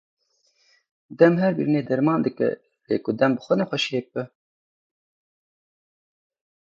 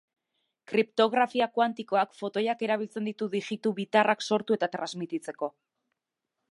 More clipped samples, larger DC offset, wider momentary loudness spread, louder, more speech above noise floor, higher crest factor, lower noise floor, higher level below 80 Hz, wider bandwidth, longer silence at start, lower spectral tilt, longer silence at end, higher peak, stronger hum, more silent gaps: neither; neither; first, 14 LU vs 10 LU; first, -22 LUFS vs -28 LUFS; second, 45 dB vs 58 dB; about the same, 22 dB vs 22 dB; second, -66 dBFS vs -86 dBFS; first, -70 dBFS vs -82 dBFS; second, 7.8 kHz vs 11.5 kHz; first, 1.1 s vs 0.7 s; first, -7 dB/octave vs -5 dB/octave; first, 2.35 s vs 1 s; first, -2 dBFS vs -8 dBFS; neither; neither